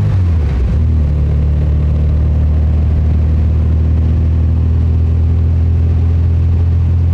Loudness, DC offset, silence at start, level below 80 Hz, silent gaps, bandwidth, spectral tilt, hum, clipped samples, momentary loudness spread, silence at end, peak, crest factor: -13 LUFS; under 0.1%; 0 s; -16 dBFS; none; 3.3 kHz; -10 dB/octave; none; under 0.1%; 1 LU; 0 s; -4 dBFS; 6 dB